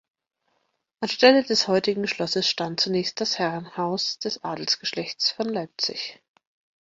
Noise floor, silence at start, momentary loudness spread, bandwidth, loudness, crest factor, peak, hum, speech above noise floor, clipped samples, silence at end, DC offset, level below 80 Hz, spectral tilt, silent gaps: -73 dBFS; 1 s; 11 LU; 7.8 kHz; -24 LUFS; 22 dB; -2 dBFS; none; 48 dB; under 0.1%; 0.7 s; under 0.1%; -70 dBFS; -3.5 dB/octave; none